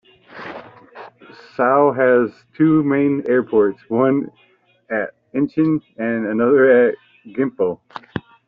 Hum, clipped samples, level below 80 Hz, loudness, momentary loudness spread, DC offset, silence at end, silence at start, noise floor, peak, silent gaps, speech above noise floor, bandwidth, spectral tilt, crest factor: none; under 0.1%; -60 dBFS; -17 LUFS; 19 LU; under 0.1%; 0.25 s; 0.35 s; -44 dBFS; -4 dBFS; none; 27 dB; 5.2 kHz; -7 dB/octave; 16 dB